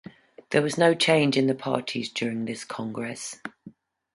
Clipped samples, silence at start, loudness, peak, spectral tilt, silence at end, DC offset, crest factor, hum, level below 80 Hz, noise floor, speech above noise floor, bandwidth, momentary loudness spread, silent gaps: under 0.1%; 0.5 s; -25 LUFS; -6 dBFS; -4.5 dB/octave; 0.45 s; under 0.1%; 22 dB; none; -68 dBFS; -50 dBFS; 25 dB; 11.5 kHz; 14 LU; none